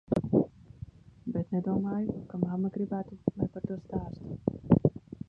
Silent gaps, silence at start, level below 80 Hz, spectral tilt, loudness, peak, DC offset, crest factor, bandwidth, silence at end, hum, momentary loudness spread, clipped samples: none; 0.1 s; -52 dBFS; -11.5 dB/octave; -32 LUFS; -8 dBFS; under 0.1%; 24 dB; 5.2 kHz; 0.3 s; none; 15 LU; under 0.1%